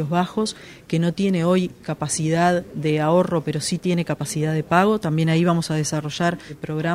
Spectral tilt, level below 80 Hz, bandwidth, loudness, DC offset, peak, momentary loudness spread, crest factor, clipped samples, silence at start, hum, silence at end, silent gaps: -5.5 dB/octave; -54 dBFS; 15 kHz; -21 LUFS; under 0.1%; -2 dBFS; 8 LU; 20 dB; under 0.1%; 0 s; none; 0 s; none